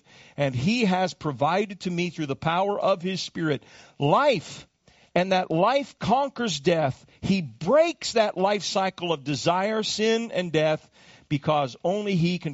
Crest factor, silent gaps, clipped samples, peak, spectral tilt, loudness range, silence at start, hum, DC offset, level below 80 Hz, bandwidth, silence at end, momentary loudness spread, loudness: 18 dB; none; under 0.1%; -8 dBFS; -4.5 dB/octave; 2 LU; 0.4 s; none; under 0.1%; -58 dBFS; 8 kHz; 0 s; 7 LU; -25 LUFS